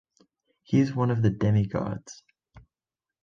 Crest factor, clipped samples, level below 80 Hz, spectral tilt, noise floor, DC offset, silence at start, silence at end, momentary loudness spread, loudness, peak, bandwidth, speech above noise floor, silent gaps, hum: 18 dB; under 0.1%; -52 dBFS; -8 dB/octave; under -90 dBFS; under 0.1%; 0.7 s; 0.65 s; 13 LU; -26 LUFS; -10 dBFS; 7.4 kHz; over 65 dB; none; none